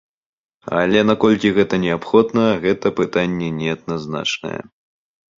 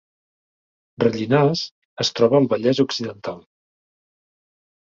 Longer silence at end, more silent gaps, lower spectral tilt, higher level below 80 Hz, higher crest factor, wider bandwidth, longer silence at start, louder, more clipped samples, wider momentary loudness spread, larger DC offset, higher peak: second, 0.8 s vs 1.45 s; second, none vs 1.71-1.96 s; about the same, -6 dB/octave vs -5.5 dB/octave; first, -50 dBFS vs -62 dBFS; about the same, 18 dB vs 20 dB; about the same, 7.6 kHz vs 7.6 kHz; second, 0.65 s vs 1 s; about the same, -18 LUFS vs -20 LUFS; neither; second, 10 LU vs 15 LU; neither; about the same, -2 dBFS vs -2 dBFS